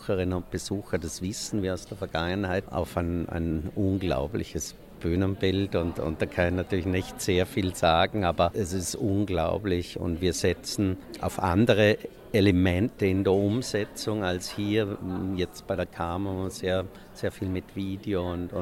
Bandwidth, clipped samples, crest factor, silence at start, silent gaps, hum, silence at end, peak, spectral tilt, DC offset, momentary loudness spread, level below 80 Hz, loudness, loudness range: 16 kHz; under 0.1%; 20 dB; 0 s; none; none; 0 s; -8 dBFS; -5.5 dB/octave; under 0.1%; 9 LU; -46 dBFS; -28 LUFS; 6 LU